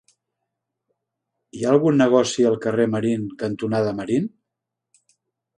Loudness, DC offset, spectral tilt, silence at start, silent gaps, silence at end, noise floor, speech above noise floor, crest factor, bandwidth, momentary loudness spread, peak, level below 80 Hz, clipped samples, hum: -20 LUFS; under 0.1%; -6 dB/octave; 1.55 s; none; 1.3 s; -83 dBFS; 64 dB; 20 dB; 11 kHz; 10 LU; -2 dBFS; -64 dBFS; under 0.1%; none